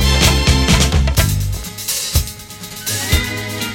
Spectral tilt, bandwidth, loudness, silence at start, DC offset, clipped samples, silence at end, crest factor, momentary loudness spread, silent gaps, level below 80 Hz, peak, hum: -3.5 dB/octave; 17 kHz; -16 LUFS; 0 s; under 0.1%; under 0.1%; 0 s; 16 dB; 12 LU; none; -20 dBFS; 0 dBFS; none